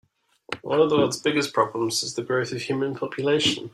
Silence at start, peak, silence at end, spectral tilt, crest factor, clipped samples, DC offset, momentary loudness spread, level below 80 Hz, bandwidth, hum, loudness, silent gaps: 0.5 s; -6 dBFS; 0.05 s; -4 dB/octave; 18 dB; under 0.1%; under 0.1%; 7 LU; -64 dBFS; 13.5 kHz; none; -24 LUFS; none